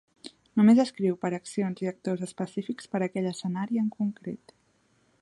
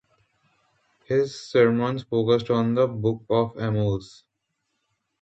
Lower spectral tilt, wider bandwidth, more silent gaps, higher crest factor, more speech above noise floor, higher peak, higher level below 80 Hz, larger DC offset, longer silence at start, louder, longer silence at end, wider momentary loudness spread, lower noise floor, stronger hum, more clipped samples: about the same, -7 dB/octave vs -7.5 dB/octave; first, 11.5 kHz vs 8.2 kHz; neither; about the same, 18 dB vs 18 dB; second, 41 dB vs 55 dB; about the same, -10 dBFS vs -8 dBFS; second, -74 dBFS vs -56 dBFS; neither; second, 0.25 s vs 1.1 s; second, -28 LUFS vs -23 LUFS; second, 0.85 s vs 1.15 s; first, 17 LU vs 6 LU; second, -68 dBFS vs -78 dBFS; neither; neither